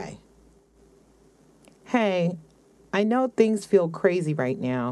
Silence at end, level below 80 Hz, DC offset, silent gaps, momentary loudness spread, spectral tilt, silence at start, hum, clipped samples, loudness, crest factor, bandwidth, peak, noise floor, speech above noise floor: 0 s; -64 dBFS; under 0.1%; none; 8 LU; -6.5 dB/octave; 0 s; none; under 0.1%; -24 LUFS; 20 dB; 12 kHz; -6 dBFS; -57 dBFS; 34 dB